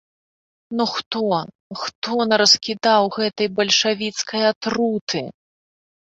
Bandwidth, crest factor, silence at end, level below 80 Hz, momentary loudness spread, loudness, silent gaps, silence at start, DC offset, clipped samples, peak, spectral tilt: 8.2 kHz; 20 dB; 0.7 s; -64 dBFS; 12 LU; -19 LUFS; 1.06-1.11 s, 1.55-1.70 s, 1.95-2.02 s, 4.56-4.61 s, 5.01-5.07 s; 0.7 s; under 0.1%; under 0.1%; 0 dBFS; -2.5 dB/octave